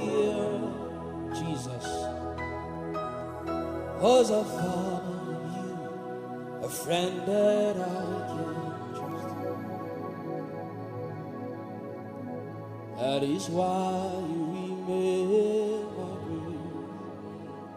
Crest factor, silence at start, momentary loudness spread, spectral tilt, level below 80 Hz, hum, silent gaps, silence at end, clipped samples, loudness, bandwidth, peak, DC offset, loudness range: 20 dB; 0 s; 13 LU; -6 dB/octave; -58 dBFS; none; none; 0 s; under 0.1%; -31 LUFS; 15.5 kHz; -10 dBFS; under 0.1%; 8 LU